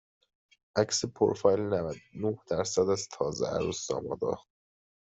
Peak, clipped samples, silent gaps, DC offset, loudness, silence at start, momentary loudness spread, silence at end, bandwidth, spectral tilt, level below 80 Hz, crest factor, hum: -10 dBFS; under 0.1%; none; under 0.1%; -30 LUFS; 0.75 s; 8 LU; 0.75 s; 8.2 kHz; -4.5 dB/octave; -62 dBFS; 20 dB; none